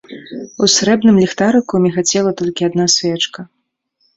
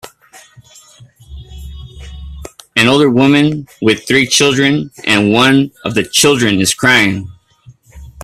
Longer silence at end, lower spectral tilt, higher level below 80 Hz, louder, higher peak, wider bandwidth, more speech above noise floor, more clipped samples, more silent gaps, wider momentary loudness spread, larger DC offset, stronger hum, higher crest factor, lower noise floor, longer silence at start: first, 0.7 s vs 0 s; about the same, -4 dB/octave vs -3.5 dB/octave; second, -52 dBFS vs -38 dBFS; about the same, -13 LUFS vs -11 LUFS; about the same, 0 dBFS vs 0 dBFS; second, 8 kHz vs 14.5 kHz; first, 50 dB vs 32 dB; neither; neither; second, 16 LU vs 23 LU; neither; neither; about the same, 16 dB vs 14 dB; first, -64 dBFS vs -44 dBFS; about the same, 0.1 s vs 0.05 s